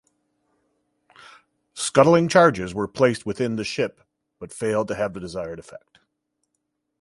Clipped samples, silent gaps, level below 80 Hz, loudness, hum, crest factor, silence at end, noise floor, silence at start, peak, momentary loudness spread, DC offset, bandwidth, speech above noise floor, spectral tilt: under 0.1%; none; -56 dBFS; -21 LUFS; 60 Hz at -55 dBFS; 24 dB; 1.25 s; -77 dBFS; 1.75 s; 0 dBFS; 19 LU; under 0.1%; 11.5 kHz; 56 dB; -5 dB/octave